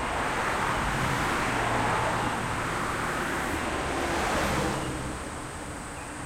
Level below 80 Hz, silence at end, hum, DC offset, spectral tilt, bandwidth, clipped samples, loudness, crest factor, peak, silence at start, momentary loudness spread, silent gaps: -42 dBFS; 0 s; none; under 0.1%; -4 dB/octave; 16.5 kHz; under 0.1%; -28 LUFS; 16 dB; -14 dBFS; 0 s; 10 LU; none